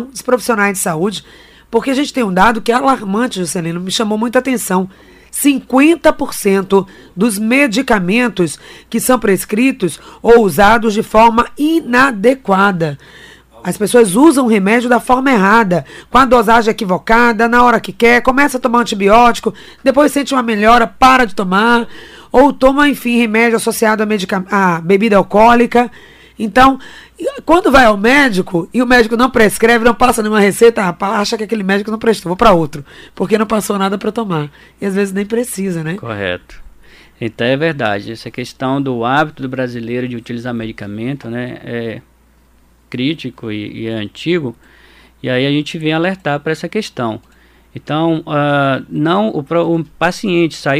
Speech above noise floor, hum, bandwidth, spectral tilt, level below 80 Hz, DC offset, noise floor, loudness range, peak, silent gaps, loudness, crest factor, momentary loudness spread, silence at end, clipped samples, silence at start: 37 dB; none; 16 kHz; -5 dB/octave; -36 dBFS; under 0.1%; -49 dBFS; 9 LU; 0 dBFS; none; -13 LUFS; 12 dB; 13 LU; 0 s; under 0.1%; 0 s